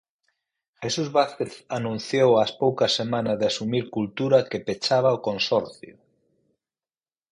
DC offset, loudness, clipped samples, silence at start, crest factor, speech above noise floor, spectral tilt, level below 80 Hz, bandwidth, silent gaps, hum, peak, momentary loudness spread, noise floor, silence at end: under 0.1%; -23 LUFS; under 0.1%; 0.8 s; 20 dB; over 67 dB; -5 dB/octave; -64 dBFS; 11 kHz; none; none; -6 dBFS; 9 LU; under -90 dBFS; 1.45 s